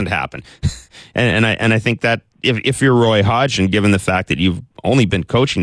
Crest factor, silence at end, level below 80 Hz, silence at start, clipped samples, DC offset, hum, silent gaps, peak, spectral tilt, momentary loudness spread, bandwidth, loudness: 14 dB; 0 s; -38 dBFS; 0 s; under 0.1%; under 0.1%; none; none; -2 dBFS; -5.5 dB/octave; 10 LU; 11 kHz; -16 LUFS